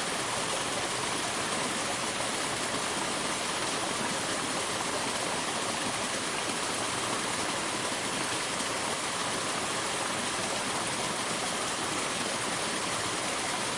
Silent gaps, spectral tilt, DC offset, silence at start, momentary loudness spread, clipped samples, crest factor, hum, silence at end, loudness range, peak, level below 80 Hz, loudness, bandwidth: none; -1.5 dB/octave; under 0.1%; 0 s; 0 LU; under 0.1%; 14 dB; none; 0 s; 0 LU; -16 dBFS; -62 dBFS; -30 LUFS; 12 kHz